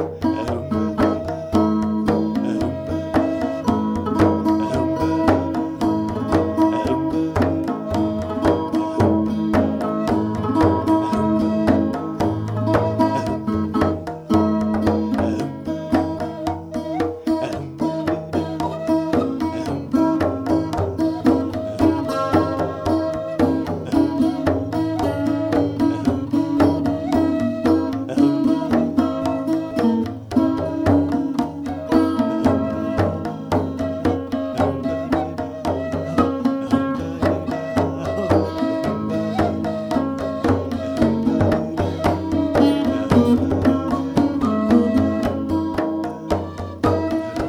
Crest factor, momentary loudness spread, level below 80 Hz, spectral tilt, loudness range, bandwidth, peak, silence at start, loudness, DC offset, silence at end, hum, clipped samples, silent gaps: 18 dB; 6 LU; -42 dBFS; -7.5 dB/octave; 3 LU; 14 kHz; -2 dBFS; 0 s; -20 LUFS; under 0.1%; 0 s; none; under 0.1%; none